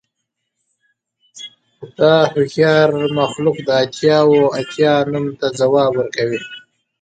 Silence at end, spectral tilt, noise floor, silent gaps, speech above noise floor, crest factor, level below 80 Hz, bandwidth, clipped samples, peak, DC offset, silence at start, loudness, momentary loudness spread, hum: 0.45 s; -6 dB/octave; -75 dBFS; none; 61 dB; 16 dB; -60 dBFS; 9.2 kHz; under 0.1%; 0 dBFS; under 0.1%; 1.35 s; -15 LUFS; 19 LU; none